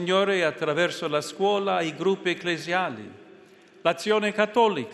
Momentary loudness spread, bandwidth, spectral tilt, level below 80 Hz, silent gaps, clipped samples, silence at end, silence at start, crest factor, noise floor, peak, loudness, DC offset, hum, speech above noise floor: 6 LU; 12.5 kHz; -4.5 dB/octave; -72 dBFS; none; under 0.1%; 0 s; 0 s; 20 dB; -52 dBFS; -6 dBFS; -25 LUFS; under 0.1%; none; 27 dB